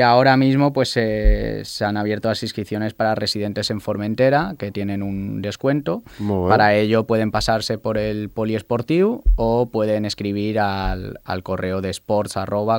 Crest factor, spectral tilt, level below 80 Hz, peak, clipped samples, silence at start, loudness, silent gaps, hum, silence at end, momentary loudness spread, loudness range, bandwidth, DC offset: 18 dB; -6 dB/octave; -30 dBFS; 0 dBFS; under 0.1%; 0 s; -20 LUFS; none; none; 0 s; 10 LU; 3 LU; 16.5 kHz; under 0.1%